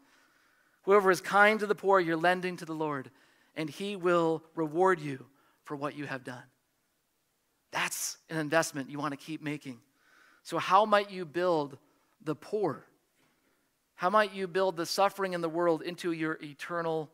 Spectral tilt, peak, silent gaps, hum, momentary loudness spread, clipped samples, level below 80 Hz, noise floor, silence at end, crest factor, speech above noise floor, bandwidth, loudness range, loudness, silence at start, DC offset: -4.5 dB/octave; -8 dBFS; none; none; 15 LU; under 0.1%; -84 dBFS; -77 dBFS; 0.1 s; 22 dB; 47 dB; 16 kHz; 7 LU; -30 LUFS; 0.85 s; under 0.1%